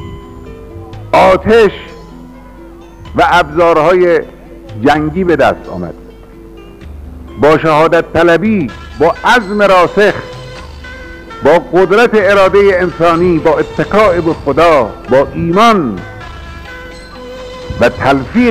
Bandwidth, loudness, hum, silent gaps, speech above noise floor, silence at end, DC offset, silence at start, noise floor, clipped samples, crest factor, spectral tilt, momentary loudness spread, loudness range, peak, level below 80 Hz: 15.5 kHz; -9 LUFS; none; none; 24 dB; 0 s; under 0.1%; 0 s; -33 dBFS; under 0.1%; 10 dB; -6 dB/octave; 21 LU; 4 LU; -2 dBFS; -32 dBFS